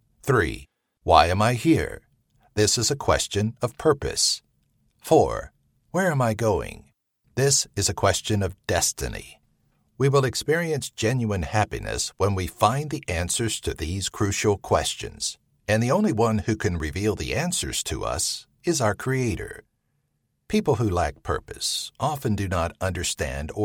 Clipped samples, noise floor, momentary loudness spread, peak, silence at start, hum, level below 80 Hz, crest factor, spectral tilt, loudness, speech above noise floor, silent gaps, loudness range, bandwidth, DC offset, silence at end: under 0.1%; -73 dBFS; 10 LU; -2 dBFS; 0.25 s; none; -42 dBFS; 24 dB; -4 dB/octave; -24 LUFS; 50 dB; none; 4 LU; 17.5 kHz; under 0.1%; 0 s